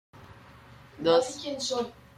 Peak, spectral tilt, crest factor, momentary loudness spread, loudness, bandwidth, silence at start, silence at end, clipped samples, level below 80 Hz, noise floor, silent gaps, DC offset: -10 dBFS; -3.5 dB/octave; 20 dB; 9 LU; -28 LUFS; 12.5 kHz; 0.15 s; 0.25 s; under 0.1%; -64 dBFS; -51 dBFS; none; under 0.1%